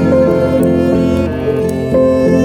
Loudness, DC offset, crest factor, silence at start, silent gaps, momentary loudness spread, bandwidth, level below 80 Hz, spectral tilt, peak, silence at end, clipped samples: -12 LUFS; under 0.1%; 10 dB; 0 s; none; 5 LU; 15.5 kHz; -32 dBFS; -8 dB/octave; 0 dBFS; 0 s; under 0.1%